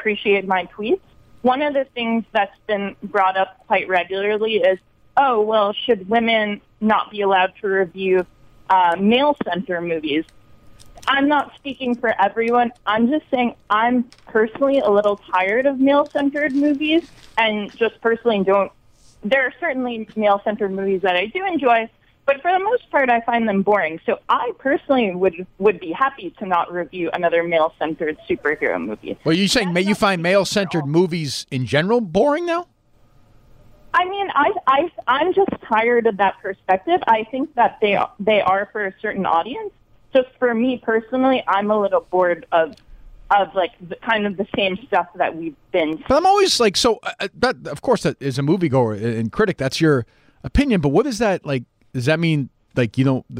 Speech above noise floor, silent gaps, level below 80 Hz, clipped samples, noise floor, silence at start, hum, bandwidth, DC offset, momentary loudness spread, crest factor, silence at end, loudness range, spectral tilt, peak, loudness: 34 dB; none; -46 dBFS; under 0.1%; -53 dBFS; 0 s; none; 15.5 kHz; under 0.1%; 7 LU; 14 dB; 0 s; 2 LU; -5.5 dB/octave; -4 dBFS; -19 LUFS